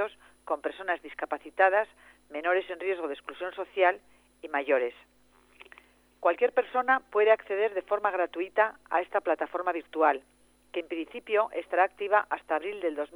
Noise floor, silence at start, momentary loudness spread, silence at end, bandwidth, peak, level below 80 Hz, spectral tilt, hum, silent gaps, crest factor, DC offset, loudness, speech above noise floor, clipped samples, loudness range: -57 dBFS; 0 s; 12 LU; 0.1 s; over 20 kHz; -8 dBFS; -72 dBFS; -4 dB/octave; 50 Hz at -70 dBFS; none; 20 dB; under 0.1%; -29 LUFS; 29 dB; under 0.1%; 3 LU